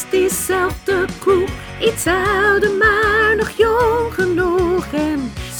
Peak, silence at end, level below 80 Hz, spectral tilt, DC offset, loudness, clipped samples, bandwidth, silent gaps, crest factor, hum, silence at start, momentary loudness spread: -2 dBFS; 0 s; -34 dBFS; -4 dB/octave; under 0.1%; -16 LUFS; under 0.1%; over 20 kHz; none; 16 dB; none; 0 s; 6 LU